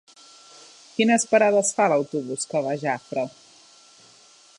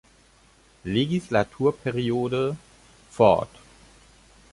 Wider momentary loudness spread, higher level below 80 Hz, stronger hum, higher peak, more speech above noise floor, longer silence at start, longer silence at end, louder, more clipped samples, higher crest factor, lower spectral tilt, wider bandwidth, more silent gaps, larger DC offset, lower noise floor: second, 12 LU vs 19 LU; second, -78 dBFS vs -54 dBFS; neither; about the same, -6 dBFS vs -4 dBFS; about the same, 31 dB vs 34 dB; first, 1 s vs 0.85 s; first, 1.3 s vs 1.05 s; about the same, -22 LUFS vs -24 LUFS; neither; about the same, 18 dB vs 22 dB; second, -3.5 dB/octave vs -6.5 dB/octave; about the same, 11.5 kHz vs 11.5 kHz; neither; neither; second, -53 dBFS vs -57 dBFS